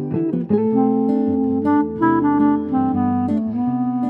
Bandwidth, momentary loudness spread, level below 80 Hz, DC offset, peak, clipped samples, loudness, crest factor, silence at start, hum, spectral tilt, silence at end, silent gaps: 3.5 kHz; 4 LU; -52 dBFS; under 0.1%; -6 dBFS; under 0.1%; -18 LUFS; 12 dB; 0 s; none; -11 dB/octave; 0 s; none